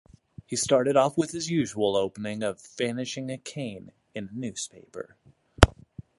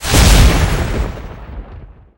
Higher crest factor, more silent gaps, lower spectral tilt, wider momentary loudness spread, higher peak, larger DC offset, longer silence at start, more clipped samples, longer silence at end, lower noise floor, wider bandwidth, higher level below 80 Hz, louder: first, 28 dB vs 12 dB; neither; about the same, -4.5 dB/octave vs -4 dB/octave; second, 19 LU vs 23 LU; about the same, 0 dBFS vs -2 dBFS; neither; first, 0.5 s vs 0 s; neither; second, 0.2 s vs 0.35 s; first, -47 dBFS vs -35 dBFS; second, 16 kHz vs over 20 kHz; second, -38 dBFS vs -16 dBFS; second, -27 LUFS vs -13 LUFS